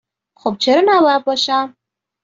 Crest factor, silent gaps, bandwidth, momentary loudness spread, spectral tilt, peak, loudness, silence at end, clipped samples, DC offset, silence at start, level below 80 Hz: 14 dB; none; 7.8 kHz; 12 LU; -3.5 dB/octave; -2 dBFS; -15 LUFS; 0.55 s; under 0.1%; under 0.1%; 0.45 s; -62 dBFS